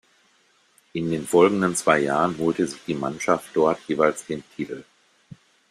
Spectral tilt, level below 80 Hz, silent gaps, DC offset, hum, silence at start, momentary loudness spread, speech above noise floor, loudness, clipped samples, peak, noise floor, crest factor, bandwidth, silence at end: -5 dB/octave; -62 dBFS; none; under 0.1%; none; 0.95 s; 15 LU; 40 dB; -23 LUFS; under 0.1%; -4 dBFS; -62 dBFS; 20 dB; 14 kHz; 0.9 s